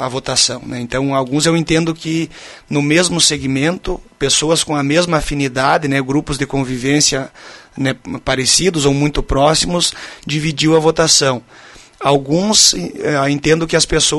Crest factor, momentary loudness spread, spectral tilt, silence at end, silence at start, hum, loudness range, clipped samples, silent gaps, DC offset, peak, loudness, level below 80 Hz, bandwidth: 16 dB; 10 LU; -3.5 dB/octave; 0 s; 0 s; none; 3 LU; under 0.1%; none; under 0.1%; 0 dBFS; -14 LUFS; -34 dBFS; 12 kHz